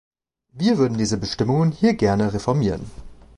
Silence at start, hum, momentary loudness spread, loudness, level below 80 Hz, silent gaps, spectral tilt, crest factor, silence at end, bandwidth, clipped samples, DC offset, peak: 0.55 s; none; 6 LU; -21 LUFS; -44 dBFS; none; -6.5 dB/octave; 16 dB; 0.25 s; 11 kHz; under 0.1%; under 0.1%; -6 dBFS